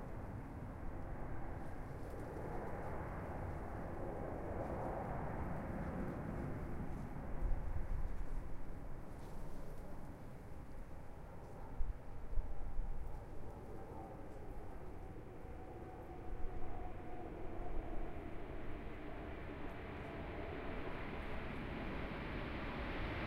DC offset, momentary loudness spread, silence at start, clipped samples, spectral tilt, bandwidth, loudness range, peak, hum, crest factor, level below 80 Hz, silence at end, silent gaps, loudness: under 0.1%; 9 LU; 0 s; under 0.1%; -7.5 dB/octave; 6.2 kHz; 7 LU; -24 dBFS; none; 20 dB; -48 dBFS; 0 s; none; -48 LUFS